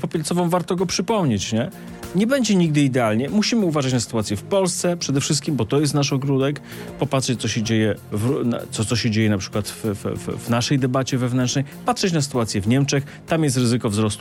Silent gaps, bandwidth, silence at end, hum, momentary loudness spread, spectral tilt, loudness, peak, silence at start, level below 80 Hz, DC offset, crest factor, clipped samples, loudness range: none; 16.5 kHz; 0 s; none; 6 LU; -5 dB/octave; -21 LUFS; -6 dBFS; 0 s; -54 dBFS; under 0.1%; 14 dB; under 0.1%; 2 LU